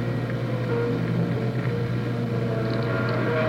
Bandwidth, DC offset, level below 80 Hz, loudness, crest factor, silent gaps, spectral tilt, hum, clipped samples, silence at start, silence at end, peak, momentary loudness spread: 7.2 kHz; under 0.1%; -48 dBFS; -26 LUFS; 14 dB; none; -8.5 dB/octave; none; under 0.1%; 0 s; 0 s; -12 dBFS; 3 LU